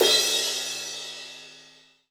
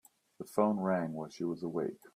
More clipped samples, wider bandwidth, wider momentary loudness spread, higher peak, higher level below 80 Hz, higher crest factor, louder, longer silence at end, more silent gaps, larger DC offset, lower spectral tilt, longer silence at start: neither; first, 19 kHz vs 15 kHz; first, 22 LU vs 9 LU; first, -6 dBFS vs -14 dBFS; first, -70 dBFS vs -78 dBFS; about the same, 20 dB vs 20 dB; first, -24 LUFS vs -35 LUFS; first, 0.5 s vs 0.1 s; neither; neither; second, 0.5 dB/octave vs -7.5 dB/octave; second, 0 s vs 0.4 s